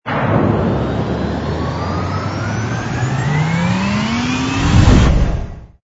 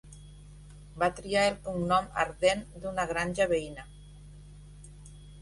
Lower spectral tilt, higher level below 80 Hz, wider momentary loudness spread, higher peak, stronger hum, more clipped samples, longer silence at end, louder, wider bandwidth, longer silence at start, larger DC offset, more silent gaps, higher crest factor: first, -6.5 dB/octave vs -4.5 dB/octave; first, -22 dBFS vs -50 dBFS; second, 9 LU vs 24 LU; first, 0 dBFS vs -12 dBFS; second, none vs 50 Hz at -45 dBFS; neither; first, 0.2 s vs 0 s; first, -16 LUFS vs -29 LUFS; second, 8 kHz vs 11.5 kHz; about the same, 0.05 s vs 0.05 s; neither; neither; about the same, 16 dB vs 20 dB